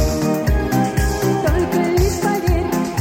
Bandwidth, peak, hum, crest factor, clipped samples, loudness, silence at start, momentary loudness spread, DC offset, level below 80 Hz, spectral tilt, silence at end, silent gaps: 17 kHz; -2 dBFS; none; 14 dB; under 0.1%; -18 LUFS; 0 s; 2 LU; under 0.1%; -24 dBFS; -6 dB/octave; 0 s; none